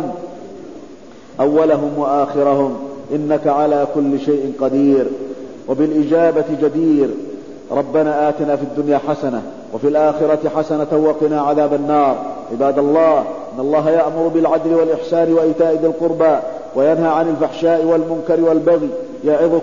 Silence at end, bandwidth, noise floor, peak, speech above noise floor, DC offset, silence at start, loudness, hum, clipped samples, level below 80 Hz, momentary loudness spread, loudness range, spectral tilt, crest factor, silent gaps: 0 s; 7.4 kHz; -38 dBFS; -2 dBFS; 23 dB; 0.7%; 0 s; -16 LUFS; none; under 0.1%; -56 dBFS; 10 LU; 2 LU; -8 dB/octave; 14 dB; none